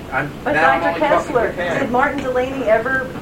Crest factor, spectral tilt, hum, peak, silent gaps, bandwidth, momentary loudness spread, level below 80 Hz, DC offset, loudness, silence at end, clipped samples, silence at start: 16 dB; -5.5 dB/octave; none; -2 dBFS; none; 16.5 kHz; 6 LU; -42 dBFS; under 0.1%; -17 LUFS; 0 s; under 0.1%; 0 s